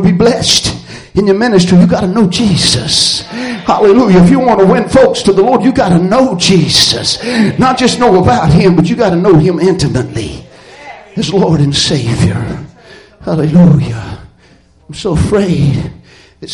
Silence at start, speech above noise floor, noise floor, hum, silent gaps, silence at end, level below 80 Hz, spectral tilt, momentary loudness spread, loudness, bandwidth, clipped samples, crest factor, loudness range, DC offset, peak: 0 s; 36 dB; -44 dBFS; none; none; 0 s; -32 dBFS; -5.5 dB/octave; 12 LU; -9 LUFS; 11.5 kHz; under 0.1%; 10 dB; 5 LU; under 0.1%; 0 dBFS